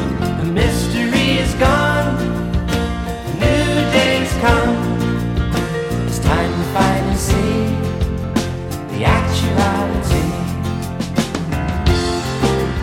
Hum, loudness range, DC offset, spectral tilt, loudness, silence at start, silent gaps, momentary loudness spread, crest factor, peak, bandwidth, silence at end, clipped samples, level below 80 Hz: none; 2 LU; under 0.1%; -5.5 dB/octave; -17 LUFS; 0 s; none; 6 LU; 16 dB; -2 dBFS; 17 kHz; 0 s; under 0.1%; -26 dBFS